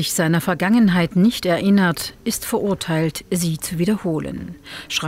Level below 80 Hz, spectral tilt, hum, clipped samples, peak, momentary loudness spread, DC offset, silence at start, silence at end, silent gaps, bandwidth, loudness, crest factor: -48 dBFS; -5 dB/octave; none; under 0.1%; -6 dBFS; 9 LU; under 0.1%; 0 s; 0 s; none; 16 kHz; -19 LUFS; 14 dB